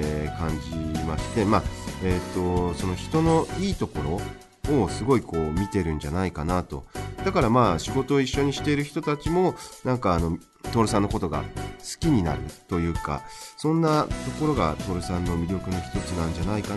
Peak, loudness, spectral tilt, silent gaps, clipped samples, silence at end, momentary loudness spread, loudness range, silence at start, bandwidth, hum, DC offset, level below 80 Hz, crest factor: -6 dBFS; -26 LUFS; -6.5 dB/octave; none; under 0.1%; 0 s; 8 LU; 2 LU; 0 s; 12 kHz; none; under 0.1%; -38 dBFS; 18 dB